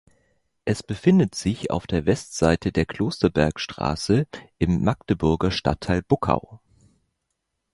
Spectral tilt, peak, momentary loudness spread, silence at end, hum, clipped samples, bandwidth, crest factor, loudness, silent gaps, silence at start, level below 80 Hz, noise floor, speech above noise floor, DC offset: -6.5 dB/octave; -2 dBFS; 7 LU; 1.15 s; none; under 0.1%; 11.5 kHz; 22 dB; -23 LUFS; none; 0.65 s; -40 dBFS; -78 dBFS; 56 dB; under 0.1%